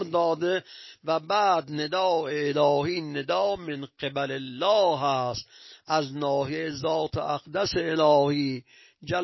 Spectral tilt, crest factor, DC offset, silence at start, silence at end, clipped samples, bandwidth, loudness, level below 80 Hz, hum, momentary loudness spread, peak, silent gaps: -5.5 dB/octave; 16 dB; under 0.1%; 0 s; 0 s; under 0.1%; 6.2 kHz; -26 LUFS; -58 dBFS; none; 10 LU; -10 dBFS; none